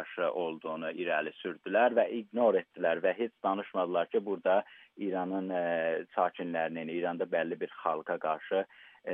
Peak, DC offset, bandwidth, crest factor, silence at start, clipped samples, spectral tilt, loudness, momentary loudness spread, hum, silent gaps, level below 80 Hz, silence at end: -14 dBFS; under 0.1%; 3.8 kHz; 18 dB; 0 s; under 0.1%; -3.5 dB/octave; -32 LUFS; 8 LU; none; none; -90 dBFS; 0 s